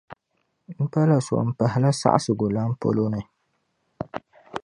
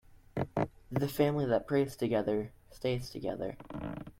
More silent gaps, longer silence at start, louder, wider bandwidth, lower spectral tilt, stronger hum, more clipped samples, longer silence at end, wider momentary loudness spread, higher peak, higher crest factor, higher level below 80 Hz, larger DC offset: neither; about the same, 0.1 s vs 0.15 s; first, -23 LUFS vs -34 LUFS; second, 11 kHz vs 16.5 kHz; about the same, -7 dB/octave vs -7 dB/octave; neither; neither; about the same, 0.05 s vs 0.1 s; first, 15 LU vs 11 LU; first, -2 dBFS vs -16 dBFS; about the same, 22 dB vs 18 dB; about the same, -58 dBFS vs -56 dBFS; neither